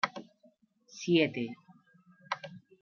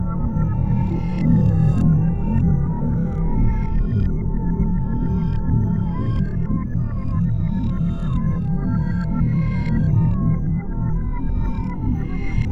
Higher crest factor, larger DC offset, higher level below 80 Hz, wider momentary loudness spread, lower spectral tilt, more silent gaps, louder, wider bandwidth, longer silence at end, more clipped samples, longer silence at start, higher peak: first, 22 dB vs 14 dB; neither; second, -84 dBFS vs -24 dBFS; first, 23 LU vs 7 LU; second, -5 dB/octave vs -10.5 dB/octave; neither; second, -32 LUFS vs -21 LUFS; first, 7 kHz vs 5 kHz; first, 0.25 s vs 0 s; neither; about the same, 0.05 s vs 0 s; second, -12 dBFS vs -4 dBFS